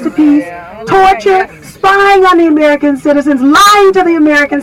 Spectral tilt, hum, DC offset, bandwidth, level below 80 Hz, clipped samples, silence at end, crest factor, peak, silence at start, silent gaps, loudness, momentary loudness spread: -3.5 dB/octave; none; under 0.1%; 16.5 kHz; -38 dBFS; under 0.1%; 0 s; 8 dB; 0 dBFS; 0 s; none; -7 LUFS; 8 LU